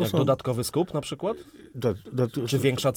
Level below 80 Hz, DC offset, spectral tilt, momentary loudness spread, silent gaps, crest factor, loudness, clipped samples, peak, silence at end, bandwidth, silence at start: -58 dBFS; under 0.1%; -6 dB/octave; 8 LU; none; 16 dB; -27 LUFS; under 0.1%; -10 dBFS; 0 s; 18.5 kHz; 0 s